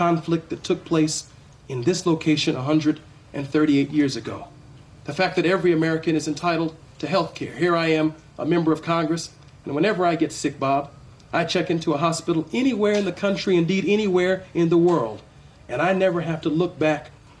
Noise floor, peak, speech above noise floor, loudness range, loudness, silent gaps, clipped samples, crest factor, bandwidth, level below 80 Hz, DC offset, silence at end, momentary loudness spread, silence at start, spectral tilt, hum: -46 dBFS; -8 dBFS; 24 dB; 2 LU; -22 LUFS; none; under 0.1%; 14 dB; 11 kHz; -56 dBFS; under 0.1%; 0.3 s; 11 LU; 0 s; -5.5 dB/octave; none